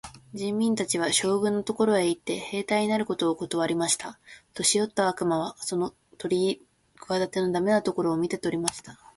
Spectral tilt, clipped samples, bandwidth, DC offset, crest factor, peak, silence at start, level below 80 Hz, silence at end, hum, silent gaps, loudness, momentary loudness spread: -3.5 dB/octave; under 0.1%; 12 kHz; under 0.1%; 22 dB; -6 dBFS; 0.05 s; -64 dBFS; 0.2 s; none; none; -26 LUFS; 8 LU